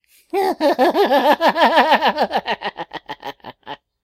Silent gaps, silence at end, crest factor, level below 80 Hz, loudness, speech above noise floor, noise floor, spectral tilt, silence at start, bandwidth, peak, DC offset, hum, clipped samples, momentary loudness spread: none; 0.3 s; 18 dB; -60 dBFS; -16 LUFS; 23 dB; -37 dBFS; -4 dB/octave; 0.35 s; 16 kHz; 0 dBFS; under 0.1%; none; under 0.1%; 20 LU